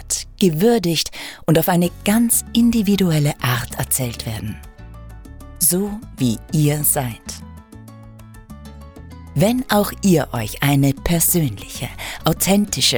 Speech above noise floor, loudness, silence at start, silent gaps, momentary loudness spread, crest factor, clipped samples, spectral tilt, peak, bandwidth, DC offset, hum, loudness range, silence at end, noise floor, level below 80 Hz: 22 dB; -18 LUFS; 0 s; none; 16 LU; 16 dB; under 0.1%; -4.5 dB/octave; -4 dBFS; over 20 kHz; under 0.1%; none; 5 LU; 0 s; -40 dBFS; -38 dBFS